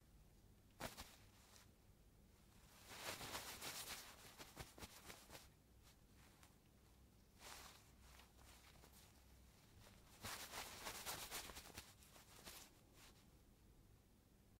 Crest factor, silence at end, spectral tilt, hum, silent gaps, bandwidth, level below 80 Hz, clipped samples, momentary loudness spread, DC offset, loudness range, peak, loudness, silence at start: 28 dB; 0 s; -2 dB/octave; none; none; 16 kHz; -72 dBFS; under 0.1%; 18 LU; under 0.1%; 11 LU; -32 dBFS; -55 LUFS; 0 s